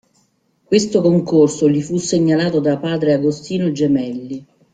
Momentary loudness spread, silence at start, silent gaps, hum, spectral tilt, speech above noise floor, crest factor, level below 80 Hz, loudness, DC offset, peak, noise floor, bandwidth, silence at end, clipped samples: 7 LU; 0.7 s; none; none; -6 dB/octave; 45 dB; 16 dB; -56 dBFS; -16 LUFS; under 0.1%; -2 dBFS; -61 dBFS; 9.4 kHz; 0.3 s; under 0.1%